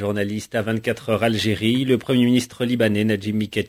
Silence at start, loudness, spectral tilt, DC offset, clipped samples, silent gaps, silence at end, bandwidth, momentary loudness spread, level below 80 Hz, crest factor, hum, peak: 0 s; -21 LUFS; -6 dB/octave; under 0.1%; under 0.1%; none; 0 s; 16 kHz; 6 LU; -50 dBFS; 16 dB; none; -6 dBFS